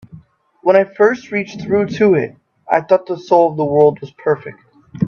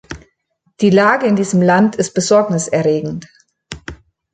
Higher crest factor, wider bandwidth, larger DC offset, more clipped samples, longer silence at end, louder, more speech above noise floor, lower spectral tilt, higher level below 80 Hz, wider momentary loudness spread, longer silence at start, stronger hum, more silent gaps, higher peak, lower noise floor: about the same, 16 dB vs 14 dB; second, 7 kHz vs 9.4 kHz; neither; neither; second, 0 s vs 0.4 s; about the same, -15 LUFS vs -14 LUFS; second, 31 dB vs 51 dB; first, -7.5 dB/octave vs -5.5 dB/octave; second, -58 dBFS vs -48 dBFS; second, 9 LU vs 21 LU; about the same, 0.15 s vs 0.1 s; neither; neither; about the same, 0 dBFS vs -2 dBFS; second, -45 dBFS vs -64 dBFS